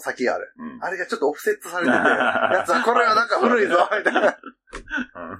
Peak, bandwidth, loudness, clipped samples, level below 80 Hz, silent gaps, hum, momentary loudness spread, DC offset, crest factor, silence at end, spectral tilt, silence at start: -2 dBFS; 16 kHz; -20 LUFS; under 0.1%; -56 dBFS; none; none; 12 LU; under 0.1%; 18 dB; 0 s; -3.5 dB/octave; 0 s